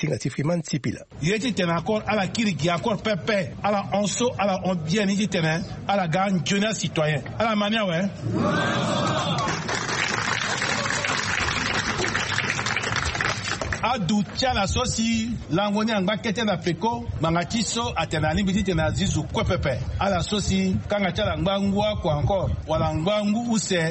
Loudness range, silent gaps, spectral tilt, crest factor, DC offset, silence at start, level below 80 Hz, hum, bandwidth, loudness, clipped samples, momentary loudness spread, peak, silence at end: 1 LU; none; -4.5 dB/octave; 16 dB; under 0.1%; 0 s; -40 dBFS; none; 8.8 kHz; -24 LUFS; under 0.1%; 3 LU; -6 dBFS; 0 s